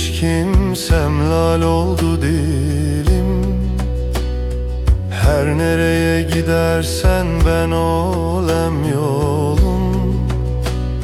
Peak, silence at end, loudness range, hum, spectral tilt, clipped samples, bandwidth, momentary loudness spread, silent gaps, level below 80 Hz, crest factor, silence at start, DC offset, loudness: -2 dBFS; 0 s; 2 LU; none; -6.5 dB/octave; under 0.1%; 15 kHz; 5 LU; none; -20 dBFS; 12 dB; 0 s; under 0.1%; -17 LUFS